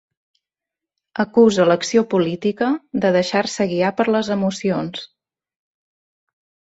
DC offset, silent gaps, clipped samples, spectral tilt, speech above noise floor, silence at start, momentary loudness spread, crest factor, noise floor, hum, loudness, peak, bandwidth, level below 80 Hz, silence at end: under 0.1%; none; under 0.1%; -5.5 dB/octave; 69 dB; 1.15 s; 10 LU; 18 dB; -87 dBFS; none; -18 LUFS; -4 dBFS; 8.2 kHz; -62 dBFS; 1.6 s